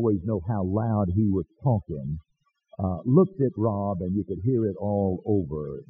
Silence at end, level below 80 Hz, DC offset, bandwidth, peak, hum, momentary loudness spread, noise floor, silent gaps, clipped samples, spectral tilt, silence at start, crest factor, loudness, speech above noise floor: 0.05 s; -50 dBFS; under 0.1%; 1.9 kHz; -6 dBFS; none; 11 LU; -58 dBFS; none; under 0.1%; -13.5 dB/octave; 0 s; 20 dB; -26 LUFS; 33 dB